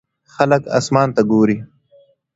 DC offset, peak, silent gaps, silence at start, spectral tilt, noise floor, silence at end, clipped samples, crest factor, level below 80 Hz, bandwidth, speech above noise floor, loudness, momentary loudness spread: under 0.1%; 0 dBFS; none; 0.4 s; -6.5 dB/octave; -53 dBFS; 0.7 s; under 0.1%; 18 dB; -54 dBFS; 8 kHz; 38 dB; -16 LUFS; 4 LU